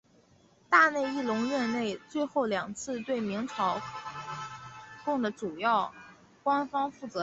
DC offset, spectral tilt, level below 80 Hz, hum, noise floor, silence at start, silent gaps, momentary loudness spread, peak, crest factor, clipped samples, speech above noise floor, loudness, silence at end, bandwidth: under 0.1%; -4.5 dB/octave; -70 dBFS; none; -62 dBFS; 0.7 s; none; 14 LU; -8 dBFS; 22 dB; under 0.1%; 33 dB; -30 LUFS; 0 s; 8.2 kHz